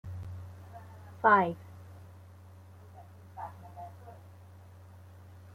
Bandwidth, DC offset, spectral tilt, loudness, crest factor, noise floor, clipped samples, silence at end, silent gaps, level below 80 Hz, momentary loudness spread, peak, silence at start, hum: 16 kHz; under 0.1%; -7.5 dB/octave; -28 LUFS; 24 dB; -52 dBFS; under 0.1%; 0 s; none; -68 dBFS; 28 LU; -10 dBFS; 0.05 s; none